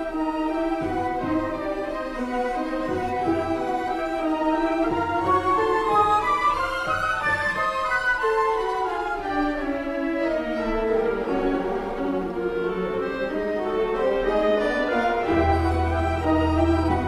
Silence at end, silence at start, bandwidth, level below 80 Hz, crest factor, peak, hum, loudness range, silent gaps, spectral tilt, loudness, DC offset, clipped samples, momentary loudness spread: 0 s; 0 s; 13 kHz; -38 dBFS; 14 dB; -8 dBFS; none; 4 LU; none; -6.5 dB/octave; -24 LUFS; under 0.1%; under 0.1%; 6 LU